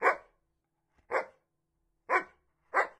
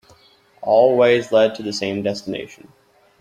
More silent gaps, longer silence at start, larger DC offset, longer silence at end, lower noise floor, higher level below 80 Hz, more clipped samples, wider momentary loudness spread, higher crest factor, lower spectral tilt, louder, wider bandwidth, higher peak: neither; second, 0 s vs 0.6 s; neither; second, 0.1 s vs 0.65 s; first, -80 dBFS vs -53 dBFS; second, -78 dBFS vs -62 dBFS; neither; about the same, 15 LU vs 16 LU; first, 24 dB vs 18 dB; second, -3 dB/octave vs -5 dB/octave; second, -33 LUFS vs -18 LUFS; first, 14 kHz vs 10.5 kHz; second, -12 dBFS vs -2 dBFS